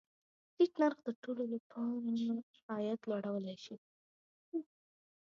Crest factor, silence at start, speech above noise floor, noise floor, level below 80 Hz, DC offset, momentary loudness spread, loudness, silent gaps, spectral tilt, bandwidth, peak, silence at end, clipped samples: 20 dB; 0.6 s; over 52 dB; under -90 dBFS; under -90 dBFS; under 0.1%; 11 LU; -38 LUFS; 1.16-1.23 s, 1.60-1.70 s, 2.43-2.54 s, 2.62-2.69 s, 3.78-4.52 s; -5.5 dB/octave; 7.2 kHz; -18 dBFS; 0.7 s; under 0.1%